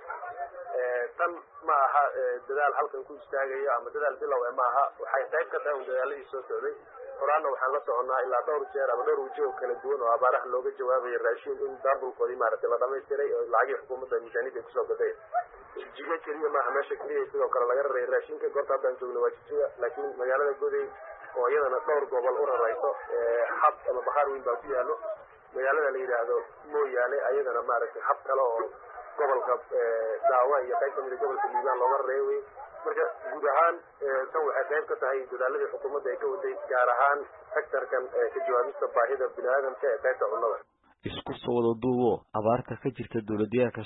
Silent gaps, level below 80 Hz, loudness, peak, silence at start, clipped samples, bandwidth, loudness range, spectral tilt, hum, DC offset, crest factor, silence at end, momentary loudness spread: none; -70 dBFS; -29 LUFS; -10 dBFS; 0 s; under 0.1%; 4 kHz; 2 LU; -9.5 dB/octave; none; under 0.1%; 18 dB; 0 s; 9 LU